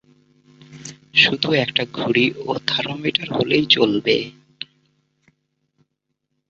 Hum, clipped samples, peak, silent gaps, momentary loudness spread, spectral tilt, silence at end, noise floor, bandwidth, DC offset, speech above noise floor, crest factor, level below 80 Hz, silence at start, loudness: none; under 0.1%; 0 dBFS; none; 21 LU; -4.5 dB/octave; 1.85 s; -76 dBFS; 8 kHz; under 0.1%; 57 dB; 22 dB; -60 dBFS; 0.7 s; -18 LUFS